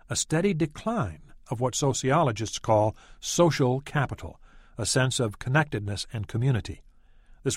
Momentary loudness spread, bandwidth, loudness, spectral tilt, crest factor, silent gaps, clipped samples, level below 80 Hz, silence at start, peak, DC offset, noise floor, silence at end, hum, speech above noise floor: 12 LU; 15.5 kHz; -27 LUFS; -5 dB/octave; 18 dB; none; under 0.1%; -50 dBFS; 0.1 s; -8 dBFS; under 0.1%; -53 dBFS; 0 s; none; 27 dB